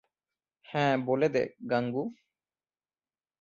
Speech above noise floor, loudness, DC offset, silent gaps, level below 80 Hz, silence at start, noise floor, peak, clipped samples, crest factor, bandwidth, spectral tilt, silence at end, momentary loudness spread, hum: over 61 dB; -30 LUFS; under 0.1%; none; -74 dBFS; 0.7 s; under -90 dBFS; -12 dBFS; under 0.1%; 20 dB; 7.4 kHz; -7 dB/octave; 1.25 s; 9 LU; none